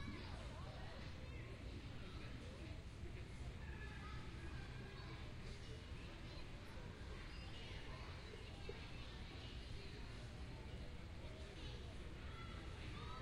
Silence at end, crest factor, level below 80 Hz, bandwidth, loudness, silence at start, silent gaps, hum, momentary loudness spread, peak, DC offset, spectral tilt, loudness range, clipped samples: 0 s; 14 dB; -56 dBFS; 13.5 kHz; -54 LUFS; 0 s; none; none; 2 LU; -36 dBFS; under 0.1%; -5.5 dB/octave; 1 LU; under 0.1%